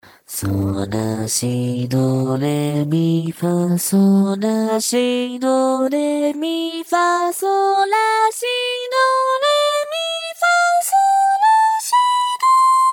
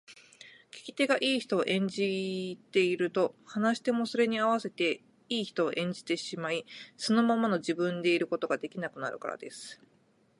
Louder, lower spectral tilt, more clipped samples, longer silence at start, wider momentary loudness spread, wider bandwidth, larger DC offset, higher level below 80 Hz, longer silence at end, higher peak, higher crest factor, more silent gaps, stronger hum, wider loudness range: first, -17 LUFS vs -30 LUFS; about the same, -4.5 dB/octave vs -5 dB/octave; neither; first, 0.3 s vs 0.1 s; second, 7 LU vs 12 LU; first, 19 kHz vs 11.5 kHz; neither; first, -60 dBFS vs -80 dBFS; second, 0 s vs 0.65 s; first, -6 dBFS vs -14 dBFS; second, 12 dB vs 18 dB; neither; neither; about the same, 3 LU vs 1 LU